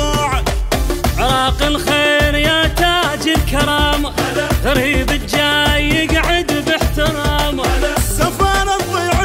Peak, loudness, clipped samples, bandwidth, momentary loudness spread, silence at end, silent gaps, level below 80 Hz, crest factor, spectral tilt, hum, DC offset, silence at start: -2 dBFS; -15 LUFS; under 0.1%; 16.5 kHz; 4 LU; 0 s; none; -22 dBFS; 14 dB; -4 dB/octave; none; under 0.1%; 0 s